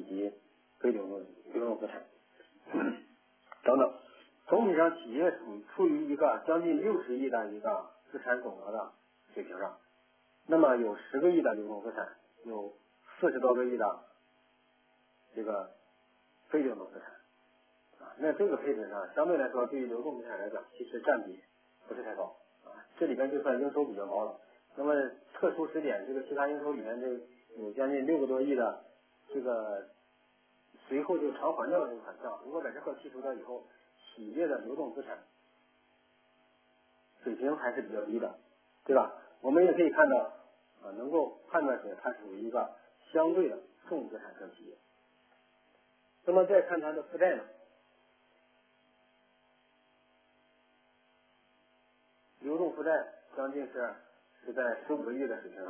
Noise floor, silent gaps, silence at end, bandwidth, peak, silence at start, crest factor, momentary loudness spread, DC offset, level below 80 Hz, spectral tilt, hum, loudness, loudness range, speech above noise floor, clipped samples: -70 dBFS; none; 0 s; 3.5 kHz; -12 dBFS; 0 s; 22 dB; 17 LU; under 0.1%; under -90 dBFS; -4.5 dB/octave; none; -33 LUFS; 9 LU; 37 dB; under 0.1%